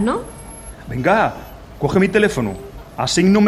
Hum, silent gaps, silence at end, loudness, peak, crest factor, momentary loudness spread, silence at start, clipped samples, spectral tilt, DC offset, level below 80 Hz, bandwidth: none; none; 0 s; -18 LUFS; -2 dBFS; 16 dB; 20 LU; 0 s; under 0.1%; -5.5 dB/octave; under 0.1%; -40 dBFS; 13.5 kHz